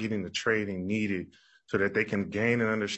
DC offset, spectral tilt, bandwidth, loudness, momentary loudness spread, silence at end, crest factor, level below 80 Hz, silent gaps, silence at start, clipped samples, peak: under 0.1%; -5.5 dB/octave; 8.4 kHz; -29 LUFS; 7 LU; 0 s; 16 dB; -68 dBFS; none; 0 s; under 0.1%; -12 dBFS